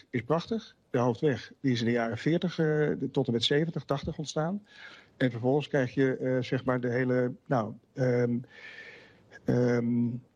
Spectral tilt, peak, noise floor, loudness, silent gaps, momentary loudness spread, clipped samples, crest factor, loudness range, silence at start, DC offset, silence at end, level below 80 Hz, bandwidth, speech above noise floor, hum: -6.5 dB/octave; -14 dBFS; -54 dBFS; -29 LUFS; none; 11 LU; under 0.1%; 14 dB; 2 LU; 0.15 s; under 0.1%; 0.15 s; -62 dBFS; 9.6 kHz; 25 dB; none